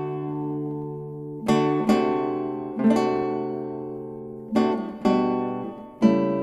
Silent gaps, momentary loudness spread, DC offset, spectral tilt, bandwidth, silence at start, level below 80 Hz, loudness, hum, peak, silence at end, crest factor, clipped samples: none; 13 LU; under 0.1%; -7.5 dB/octave; 12 kHz; 0 s; -58 dBFS; -25 LUFS; none; -4 dBFS; 0 s; 20 dB; under 0.1%